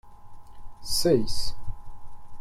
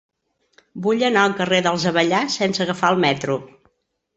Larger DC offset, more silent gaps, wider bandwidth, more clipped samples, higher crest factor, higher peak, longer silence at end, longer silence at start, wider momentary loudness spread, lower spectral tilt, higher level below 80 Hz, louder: neither; neither; first, 15 kHz vs 8.2 kHz; neither; about the same, 16 dB vs 18 dB; second, -10 dBFS vs -2 dBFS; second, 0 s vs 0.7 s; second, 0.05 s vs 0.75 s; first, 21 LU vs 7 LU; about the same, -4.5 dB/octave vs -4.5 dB/octave; first, -40 dBFS vs -62 dBFS; second, -26 LUFS vs -19 LUFS